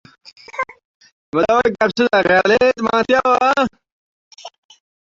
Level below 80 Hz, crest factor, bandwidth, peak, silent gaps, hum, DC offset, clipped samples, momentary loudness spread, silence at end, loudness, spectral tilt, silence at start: -54 dBFS; 16 dB; 7.6 kHz; -2 dBFS; 0.84-1.00 s, 1.12-1.32 s, 3.92-4.31 s; none; under 0.1%; under 0.1%; 13 LU; 0.65 s; -16 LUFS; -4.5 dB/octave; 0.55 s